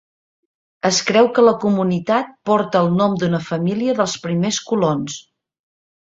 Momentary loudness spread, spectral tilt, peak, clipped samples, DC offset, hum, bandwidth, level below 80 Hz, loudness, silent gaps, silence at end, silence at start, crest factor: 7 LU; -5 dB/octave; -2 dBFS; under 0.1%; under 0.1%; none; 8 kHz; -58 dBFS; -18 LUFS; none; 0.85 s; 0.85 s; 18 dB